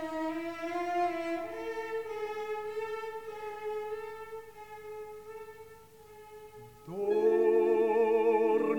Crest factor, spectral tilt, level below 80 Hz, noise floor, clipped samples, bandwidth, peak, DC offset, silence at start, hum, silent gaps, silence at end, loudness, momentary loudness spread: 16 dB; -6 dB/octave; -70 dBFS; -54 dBFS; under 0.1%; 18.5 kHz; -16 dBFS; 0.1%; 0 s; 50 Hz at -70 dBFS; none; 0 s; -31 LUFS; 23 LU